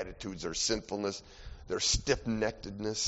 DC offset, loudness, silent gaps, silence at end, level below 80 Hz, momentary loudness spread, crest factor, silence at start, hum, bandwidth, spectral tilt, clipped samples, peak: under 0.1%; -33 LUFS; none; 0 s; -46 dBFS; 13 LU; 20 dB; 0 s; none; 8 kHz; -3 dB/octave; under 0.1%; -14 dBFS